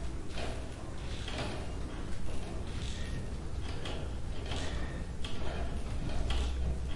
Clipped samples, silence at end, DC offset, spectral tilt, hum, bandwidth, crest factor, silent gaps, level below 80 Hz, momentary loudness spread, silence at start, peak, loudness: under 0.1%; 0 s; 0.3%; -5.5 dB/octave; none; 11.5 kHz; 14 dB; none; -38 dBFS; 6 LU; 0 s; -20 dBFS; -40 LUFS